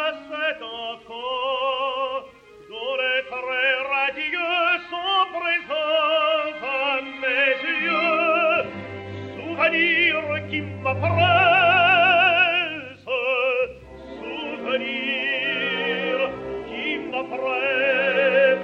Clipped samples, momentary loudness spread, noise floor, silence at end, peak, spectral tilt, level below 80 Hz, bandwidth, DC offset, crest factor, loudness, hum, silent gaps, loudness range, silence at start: under 0.1%; 16 LU; -45 dBFS; 0 s; -6 dBFS; -6 dB/octave; -60 dBFS; 7 kHz; under 0.1%; 16 dB; -21 LUFS; none; none; 7 LU; 0 s